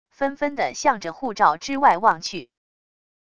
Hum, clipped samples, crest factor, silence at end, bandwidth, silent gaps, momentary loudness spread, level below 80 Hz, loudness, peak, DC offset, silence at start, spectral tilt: none; under 0.1%; 20 dB; 0.8 s; 10 kHz; none; 12 LU; -60 dBFS; -21 LUFS; -2 dBFS; 0.5%; 0.2 s; -3 dB/octave